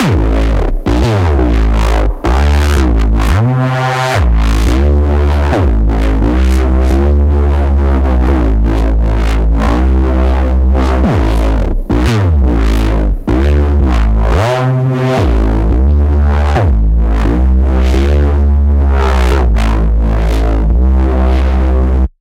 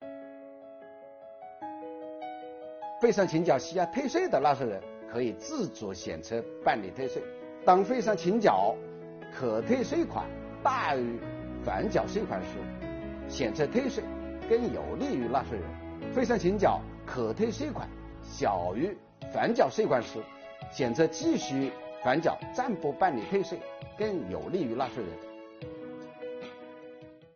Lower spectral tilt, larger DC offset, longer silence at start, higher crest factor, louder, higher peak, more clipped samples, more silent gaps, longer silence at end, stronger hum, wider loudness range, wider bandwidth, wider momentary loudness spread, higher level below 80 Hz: first, -7.5 dB/octave vs -5 dB/octave; neither; about the same, 0 s vs 0 s; second, 10 dB vs 22 dB; first, -12 LUFS vs -30 LUFS; first, 0 dBFS vs -8 dBFS; neither; neither; about the same, 0.1 s vs 0.1 s; neither; second, 1 LU vs 4 LU; first, 9.8 kHz vs 7 kHz; second, 2 LU vs 18 LU; first, -10 dBFS vs -54 dBFS